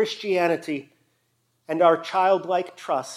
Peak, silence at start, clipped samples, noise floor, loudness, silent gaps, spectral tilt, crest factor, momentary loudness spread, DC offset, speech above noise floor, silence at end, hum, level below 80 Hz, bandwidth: -6 dBFS; 0 s; under 0.1%; -70 dBFS; -23 LUFS; none; -4.5 dB/octave; 18 dB; 11 LU; under 0.1%; 47 dB; 0 s; none; -86 dBFS; 14 kHz